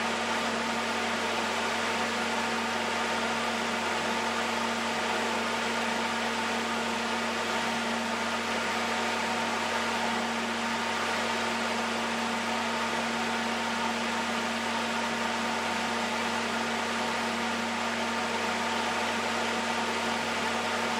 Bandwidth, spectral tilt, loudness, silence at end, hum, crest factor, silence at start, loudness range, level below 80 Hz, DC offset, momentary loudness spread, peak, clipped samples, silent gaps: 16 kHz; -2.5 dB/octave; -29 LUFS; 0 s; none; 14 dB; 0 s; 1 LU; -74 dBFS; under 0.1%; 1 LU; -16 dBFS; under 0.1%; none